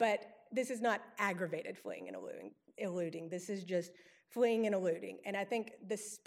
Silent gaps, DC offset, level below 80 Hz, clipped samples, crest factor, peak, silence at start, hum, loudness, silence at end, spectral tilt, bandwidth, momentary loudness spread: none; under 0.1%; under -90 dBFS; under 0.1%; 20 dB; -18 dBFS; 0 s; none; -39 LUFS; 0.1 s; -4.5 dB/octave; 16 kHz; 13 LU